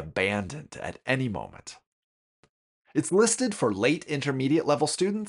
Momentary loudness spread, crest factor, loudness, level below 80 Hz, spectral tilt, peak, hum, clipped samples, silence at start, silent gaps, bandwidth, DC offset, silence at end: 15 LU; 20 dB; -26 LUFS; -60 dBFS; -4.5 dB/octave; -8 dBFS; none; under 0.1%; 0 s; 1.86-2.43 s, 2.49-2.82 s; 11.5 kHz; under 0.1%; 0 s